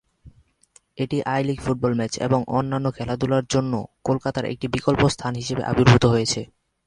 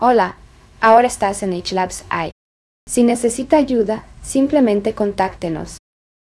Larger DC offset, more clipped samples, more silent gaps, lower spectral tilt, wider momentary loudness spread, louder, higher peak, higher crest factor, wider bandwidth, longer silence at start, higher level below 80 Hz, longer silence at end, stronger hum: neither; neither; second, none vs 2.32-2.87 s; first, -6 dB/octave vs -4.5 dB/octave; about the same, 10 LU vs 12 LU; second, -22 LUFS vs -17 LUFS; about the same, -2 dBFS vs 0 dBFS; about the same, 22 dB vs 18 dB; about the same, 11 kHz vs 12 kHz; first, 0.25 s vs 0 s; about the same, -46 dBFS vs -44 dBFS; second, 0.4 s vs 0.55 s; neither